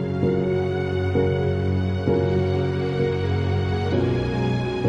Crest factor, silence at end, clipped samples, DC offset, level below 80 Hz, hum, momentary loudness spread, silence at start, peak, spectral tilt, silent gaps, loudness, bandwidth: 16 dB; 0 s; under 0.1%; under 0.1%; -44 dBFS; none; 2 LU; 0 s; -6 dBFS; -8.5 dB/octave; none; -23 LUFS; 7.2 kHz